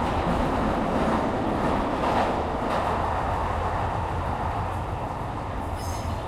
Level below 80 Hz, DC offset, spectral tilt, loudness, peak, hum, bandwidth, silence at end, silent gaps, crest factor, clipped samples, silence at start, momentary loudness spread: -36 dBFS; under 0.1%; -6.5 dB/octave; -26 LUFS; -12 dBFS; none; 15.5 kHz; 0 s; none; 14 dB; under 0.1%; 0 s; 7 LU